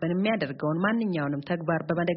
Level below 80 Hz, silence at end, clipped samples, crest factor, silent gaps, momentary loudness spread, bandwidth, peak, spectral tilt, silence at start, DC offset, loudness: -64 dBFS; 0 s; under 0.1%; 16 dB; none; 4 LU; 5.6 kHz; -10 dBFS; -5.5 dB/octave; 0 s; under 0.1%; -27 LUFS